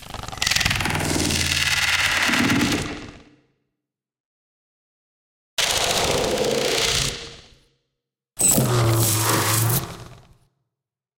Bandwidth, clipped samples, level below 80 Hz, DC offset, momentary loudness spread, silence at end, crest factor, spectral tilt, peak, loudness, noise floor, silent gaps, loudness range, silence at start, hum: 17 kHz; under 0.1%; -42 dBFS; under 0.1%; 12 LU; 1 s; 22 dB; -3 dB/octave; -2 dBFS; -19 LUFS; -85 dBFS; 4.20-5.57 s; 6 LU; 0 s; none